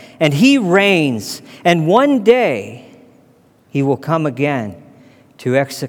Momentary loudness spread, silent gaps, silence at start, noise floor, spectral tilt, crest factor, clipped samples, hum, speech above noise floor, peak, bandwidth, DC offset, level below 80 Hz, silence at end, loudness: 13 LU; none; 0 s; -51 dBFS; -6 dB/octave; 16 dB; under 0.1%; none; 36 dB; 0 dBFS; 18.5 kHz; under 0.1%; -64 dBFS; 0 s; -15 LUFS